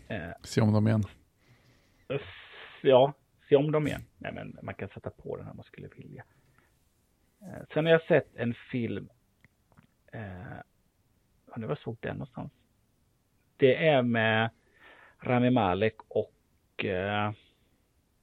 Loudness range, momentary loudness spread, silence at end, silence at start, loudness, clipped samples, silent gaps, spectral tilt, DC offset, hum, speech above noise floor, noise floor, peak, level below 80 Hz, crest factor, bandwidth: 14 LU; 23 LU; 0.9 s; 0.1 s; -28 LUFS; under 0.1%; none; -7 dB/octave; under 0.1%; none; 42 dB; -70 dBFS; -8 dBFS; -64 dBFS; 22 dB; 12 kHz